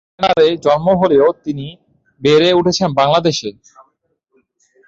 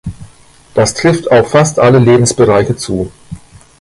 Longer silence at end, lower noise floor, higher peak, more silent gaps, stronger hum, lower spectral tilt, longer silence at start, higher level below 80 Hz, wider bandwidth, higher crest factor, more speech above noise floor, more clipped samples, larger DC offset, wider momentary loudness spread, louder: first, 1.35 s vs 0.45 s; first, -64 dBFS vs -41 dBFS; about the same, -2 dBFS vs 0 dBFS; neither; neither; about the same, -5 dB/octave vs -5.5 dB/octave; first, 0.2 s vs 0.05 s; second, -50 dBFS vs -38 dBFS; second, 7.8 kHz vs 11.5 kHz; about the same, 12 dB vs 12 dB; first, 51 dB vs 32 dB; neither; neither; about the same, 13 LU vs 11 LU; second, -14 LUFS vs -10 LUFS